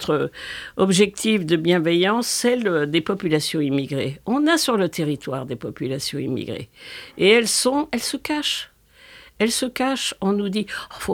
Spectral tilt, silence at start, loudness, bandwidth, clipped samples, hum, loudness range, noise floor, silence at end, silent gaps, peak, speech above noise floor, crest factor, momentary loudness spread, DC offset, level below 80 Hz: -4 dB/octave; 0 s; -21 LUFS; 20 kHz; under 0.1%; none; 4 LU; -48 dBFS; 0 s; none; -2 dBFS; 27 dB; 20 dB; 12 LU; under 0.1%; -56 dBFS